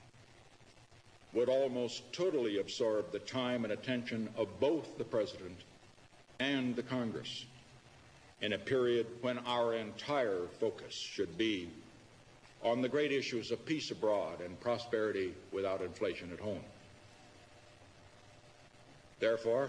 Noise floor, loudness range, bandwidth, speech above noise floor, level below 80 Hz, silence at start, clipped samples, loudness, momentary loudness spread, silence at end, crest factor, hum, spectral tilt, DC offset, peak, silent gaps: -61 dBFS; 5 LU; 11 kHz; 25 dB; -72 dBFS; 0 s; under 0.1%; -37 LUFS; 9 LU; 0 s; 18 dB; none; -5 dB/octave; under 0.1%; -20 dBFS; none